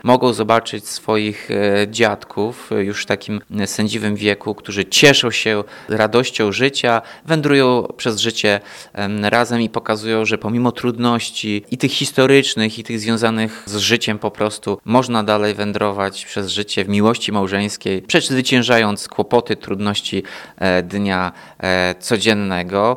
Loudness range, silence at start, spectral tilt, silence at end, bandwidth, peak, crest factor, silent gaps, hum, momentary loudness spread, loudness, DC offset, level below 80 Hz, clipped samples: 4 LU; 0.05 s; -4 dB/octave; 0 s; 17.5 kHz; 0 dBFS; 18 dB; none; none; 9 LU; -17 LUFS; under 0.1%; -56 dBFS; under 0.1%